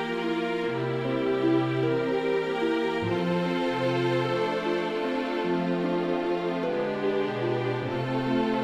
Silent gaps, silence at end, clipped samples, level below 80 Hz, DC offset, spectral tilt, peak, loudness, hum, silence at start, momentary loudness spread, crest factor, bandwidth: none; 0 s; under 0.1%; -60 dBFS; under 0.1%; -7 dB/octave; -14 dBFS; -27 LUFS; none; 0 s; 3 LU; 14 dB; 10.5 kHz